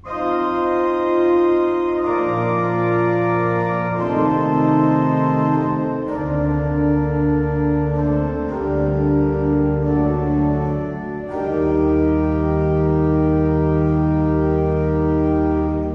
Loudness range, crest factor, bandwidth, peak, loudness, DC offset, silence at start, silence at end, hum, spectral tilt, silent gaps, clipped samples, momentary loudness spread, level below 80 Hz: 2 LU; 12 dB; 5.8 kHz; -4 dBFS; -19 LUFS; under 0.1%; 0.05 s; 0 s; none; -10.5 dB/octave; none; under 0.1%; 5 LU; -30 dBFS